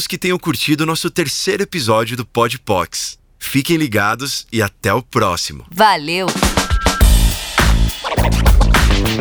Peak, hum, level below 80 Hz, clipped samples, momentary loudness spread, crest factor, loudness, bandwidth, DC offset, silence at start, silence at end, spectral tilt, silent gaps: 0 dBFS; none; -20 dBFS; under 0.1%; 7 LU; 14 dB; -16 LUFS; over 20 kHz; under 0.1%; 0 s; 0 s; -4 dB/octave; none